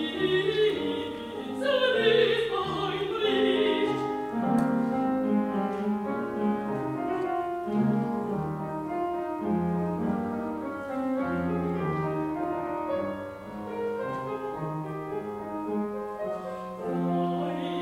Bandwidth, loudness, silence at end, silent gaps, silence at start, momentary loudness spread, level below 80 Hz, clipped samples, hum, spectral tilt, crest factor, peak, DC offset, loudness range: 15.5 kHz; -29 LUFS; 0 s; none; 0 s; 10 LU; -60 dBFS; under 0.1%; none; -7 dB/octave; 16 dB; -12 dBFS; under 0.1%; 7 LU